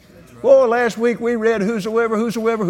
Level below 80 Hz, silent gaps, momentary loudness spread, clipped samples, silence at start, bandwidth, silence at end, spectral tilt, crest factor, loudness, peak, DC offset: -56 dBFS; none; 7 LU; under 0.1%; 0.35 s; 16 kHz; 0 s; -6 dB/octave; 16 dB; -17 LUFS; -2 dBFS; under 0.1%